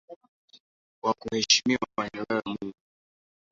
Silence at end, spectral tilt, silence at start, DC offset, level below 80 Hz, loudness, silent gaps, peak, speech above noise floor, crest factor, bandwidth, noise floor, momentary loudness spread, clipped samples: 0.8 s; -2 dB/octave; 0.1 s; under 0.1%; -64 dBFS; -27 LUFS; 0.16-0.21 s, 0.28-0.48 s, 0.60-1.02 s; -6 dBFS; over 62 dB; 26 dB; 7.8 kHz; under -90 dBFS; 15 LU; under 0.1%